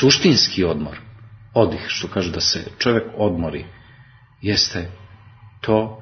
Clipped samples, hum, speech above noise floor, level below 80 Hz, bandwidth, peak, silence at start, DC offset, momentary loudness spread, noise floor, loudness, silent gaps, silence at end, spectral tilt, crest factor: under 0.1%; none; 29 dB; -46 dBFS; 6.6 kHz; 0 dBFS; 0 s; under 0.1%; 16 LU; -48 dBFS; -19 LUFS; none; 0 s; -4 dB/octave; 20 dB